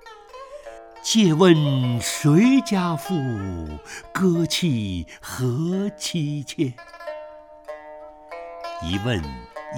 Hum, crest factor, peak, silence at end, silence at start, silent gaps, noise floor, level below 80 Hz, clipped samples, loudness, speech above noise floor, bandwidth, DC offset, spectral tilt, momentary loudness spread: none; 20 dB; -2 dBFS; 0 s; 0.05 s; none; -42 dBFS; -48 dBFS; under 0.1%; -21 LUFS; 21 dB; 19 kHz; under 0.1%; -5.5 dB/octave; 23 LU